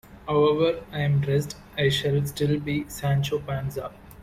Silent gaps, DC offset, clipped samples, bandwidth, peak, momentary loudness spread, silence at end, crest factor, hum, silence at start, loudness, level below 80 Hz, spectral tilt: none; under 0.1%; under 0.1%; 15.5 kHz; -10 dBFS; 9 LU; 0 s; 16 dB; none; 0.1 s; -25 LUFS; -50 dBFS; -6 dB/octave